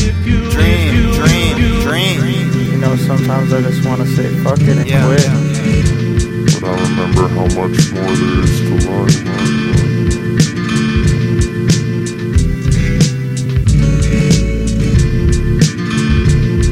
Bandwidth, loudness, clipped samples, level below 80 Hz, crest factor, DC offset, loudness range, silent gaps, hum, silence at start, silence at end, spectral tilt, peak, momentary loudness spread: 16 kHz; -13 LUFS; under 0.1%; -20 dBFS; 12 dB; under 0.1%; 1 LU; none; none; 0 s; 0 s; -6 dB/octave; 0 dBFS; 4 LU